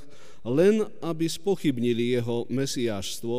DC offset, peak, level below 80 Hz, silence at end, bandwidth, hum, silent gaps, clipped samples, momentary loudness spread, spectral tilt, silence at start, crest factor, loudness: 2%; -10 dBFS; -62 dBFS; 0 s; 15.5 kHz; none; none; under 0.1%; 8 LU; -5.5 dB/octave; 0.45 s; 16 dB; -26 LUFS